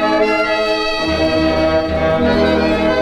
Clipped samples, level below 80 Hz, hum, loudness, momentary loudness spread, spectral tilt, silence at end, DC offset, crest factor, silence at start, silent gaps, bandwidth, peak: under 0.1%; -34 dBFS; none; -15 LUFS; 2 LU; -6 dB/octave; 0 s; under 0.1%; 12 dB; 0 s; none; 12 kHz; -2 dBFS